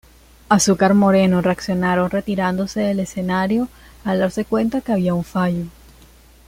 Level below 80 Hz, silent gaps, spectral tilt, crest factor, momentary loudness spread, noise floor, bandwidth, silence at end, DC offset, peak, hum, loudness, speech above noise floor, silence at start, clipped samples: -46 dBFS; none; -5.5 dB/octave; 18 dB; 8 LU; -47 dBFS; 16 kHz; 0.75 s; under 0.1%; 0 dBFS; none; -19 LUFS; 29 dB; 0.5 s; under 0.1%